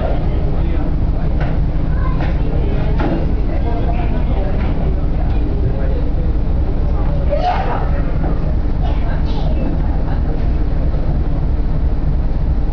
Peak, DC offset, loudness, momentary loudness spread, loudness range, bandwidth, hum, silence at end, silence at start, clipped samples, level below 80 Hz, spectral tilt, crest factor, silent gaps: -6 dBFS; 0.7%; -19 LUFS; 2 LU; 1 LU; 5.4 kHz; none; 0 s; 0 s; under 0.1%; -16 dBFS; -10 dB/octave; 8 dB; none